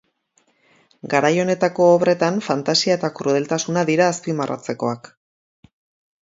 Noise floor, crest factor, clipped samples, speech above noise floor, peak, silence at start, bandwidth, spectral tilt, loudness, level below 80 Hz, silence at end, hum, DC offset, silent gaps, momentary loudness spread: -64 dBFS; 20 dB; under 0.1%; 45 dB; -2 dBFS; 1.05 s; 7.8 kHz; -4.5 dB/octave; -19 LUFS; -68 dBFS; 1.25 s; none; under 0.1%; none; 10 LU